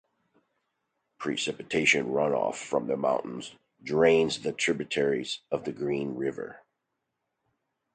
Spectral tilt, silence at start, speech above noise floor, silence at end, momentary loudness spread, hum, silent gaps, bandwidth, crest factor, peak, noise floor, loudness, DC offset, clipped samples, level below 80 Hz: -4 dB/octave; 1.2 s; 54 dB; 1.35 s; 15 LU; none; none; 9.4 kHz; 22 dB; -8 dBFS; -82 dBFS; -28 LUFS; under 0.1%; under 0.1%; -66 dBFS